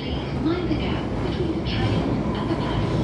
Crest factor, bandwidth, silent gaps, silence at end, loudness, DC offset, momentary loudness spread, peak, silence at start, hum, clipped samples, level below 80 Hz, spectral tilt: 12 dB; 10.5 kHz; none; 0 s; -25 LUFS; under 0.1%; 3 LU; -12 dBFS; 0 s; none; under 0.1%; -34 dBFS; -7.5 dB/octave